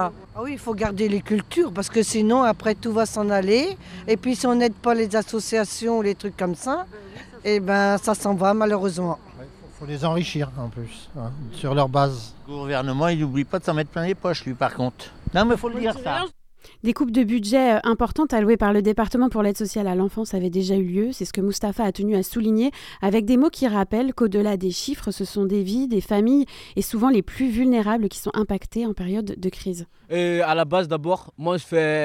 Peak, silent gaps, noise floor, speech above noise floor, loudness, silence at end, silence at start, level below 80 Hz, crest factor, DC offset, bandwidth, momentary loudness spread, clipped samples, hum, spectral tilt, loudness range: -4 dBFS; none; -42 dBFS; 20 dB; -22 LUFS; 0 s; 0 s; -44 dBFS; 18 dB; under 0.1%; 16.5 kHz; 9 LU; under 0.1%; none; -5.5 dB/octave; 4 LU